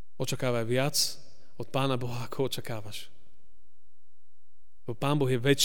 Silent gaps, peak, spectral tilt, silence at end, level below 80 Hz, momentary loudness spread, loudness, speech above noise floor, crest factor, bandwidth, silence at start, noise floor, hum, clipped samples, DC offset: none; -12 dBFS; -4.5 dB/octave; 0 s; -60 dBFS; 16 LU; -30 LUFS; 51 dB; 20 dB; 17 kHz; 0.2 s; -80 dBFS; none; under 0.1%; 2%